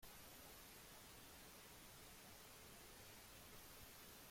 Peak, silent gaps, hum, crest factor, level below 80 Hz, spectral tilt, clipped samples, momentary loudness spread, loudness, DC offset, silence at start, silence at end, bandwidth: -46 dBFS; none; none; 14 dB; -72 dBFS; -2.5 dB/octave; under 0.1%; 1 LU; -60 LUFS; under 0.1%; 0 s; 0 s; 16.5 kHz